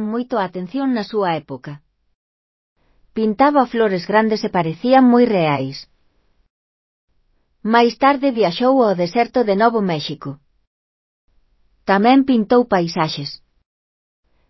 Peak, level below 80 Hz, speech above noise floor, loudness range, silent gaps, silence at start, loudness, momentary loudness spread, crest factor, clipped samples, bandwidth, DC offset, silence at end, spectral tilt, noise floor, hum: 0 dBFS; -58 dBFS; 45 dB; 4 LU; 2.15-2.76 s, 6.50-7.08 s, 10.67-11.28 s; 0 s; -17 LUFS; 16 LU; 18 dB; under 0.1%; 6 kHz; under 0.1%; 1.15 s; -7 dB/octave; -62 dBFS; none